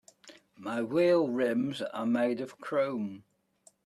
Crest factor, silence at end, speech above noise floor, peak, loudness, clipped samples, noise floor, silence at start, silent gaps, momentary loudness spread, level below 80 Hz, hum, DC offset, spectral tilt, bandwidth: 16 dB; 0.65 s; 35 dB; -16 dBFS; -30 LUFS; under 0.1%; -65 dBFS; 0.25 s; none; 12 LU; -78 dBFS; none; under 0.1%; -6.5 dB/octave; 13 kHz